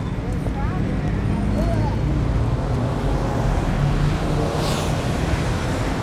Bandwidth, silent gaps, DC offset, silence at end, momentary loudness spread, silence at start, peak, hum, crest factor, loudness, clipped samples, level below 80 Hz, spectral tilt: 14 kHz; none; under 0.1%; 0 s; 2 LU; 0 s; -8 dBFS; none; 14 dB; -22 LUFS; under 0.1%; -26 dBFS; -6.5 dB/octave